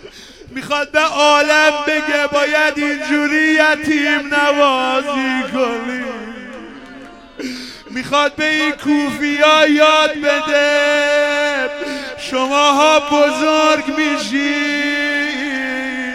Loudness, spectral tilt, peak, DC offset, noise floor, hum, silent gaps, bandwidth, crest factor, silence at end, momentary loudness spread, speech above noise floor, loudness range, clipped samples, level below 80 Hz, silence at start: -14 LUFS; -2 dB/octave; 0 dBFS; under 0.1%; -37 dBFS; none; none; 15 kHz; 16 dB; 0 s; 15 LU; 23 dB; 6 LU; under 0.1%; -50 dBFS; 0.05 s